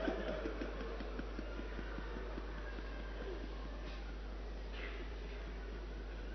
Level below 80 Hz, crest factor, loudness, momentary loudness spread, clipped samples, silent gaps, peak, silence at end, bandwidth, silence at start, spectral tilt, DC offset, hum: -46 dBFS; 20 dB; -46 LUFS; 5 LU; under 0.1%; none; -24 dBFS; 0 s; 6.4 kHz; 0 s; -5 dB/octave; under 0.1%; none